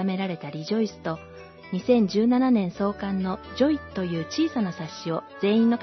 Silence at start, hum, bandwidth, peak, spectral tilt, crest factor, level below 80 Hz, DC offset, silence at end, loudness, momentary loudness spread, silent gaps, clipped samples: 0 s; none; 6.2 kHz; -8 dBFS; -7 dB/octave; 16 dB; -58 dBFS; under 0.1%; 0 s; -25 LUFS; 12 LU; none; under 0.1%